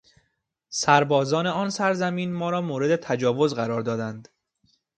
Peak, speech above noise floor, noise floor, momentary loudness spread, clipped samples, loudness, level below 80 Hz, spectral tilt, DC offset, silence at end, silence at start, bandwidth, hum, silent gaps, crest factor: -2 dBFS; 51 dB; -75 dBFS; 10 LU; under 0.1%; -24 LUFS; -66 dBFS; -5 dB/octave; under 0.1%; 0.75 s; 0.7 s; 9.2 kHz; none; none; 22 dB